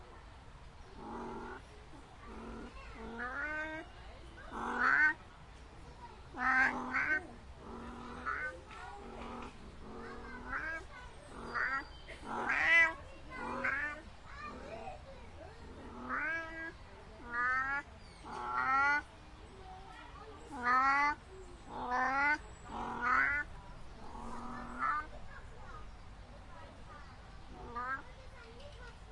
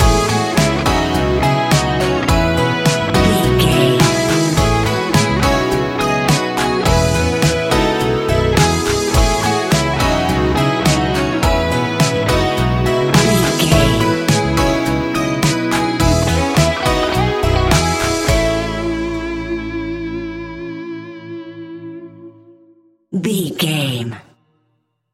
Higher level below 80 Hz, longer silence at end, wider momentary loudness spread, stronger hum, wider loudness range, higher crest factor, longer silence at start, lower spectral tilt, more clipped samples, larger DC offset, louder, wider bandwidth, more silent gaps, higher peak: second, -56 dBFS vs -26 dBFS; second, 0 s vs 0.9 s; first, 23 LU vs 11 LU; neither; about the same, 11 LU vs 10 LU; first, 22 dB vs 16 dB; about the same, 0 s vs 0 s; about the same, -4 dB/octave vs -5 dB/octave; neither; neither; second, -35 LUFS vs -15 LUFS; second, 11.5 kHz vs 16.5 kHz; neither; second, -16 dBFS vs 0 dBFS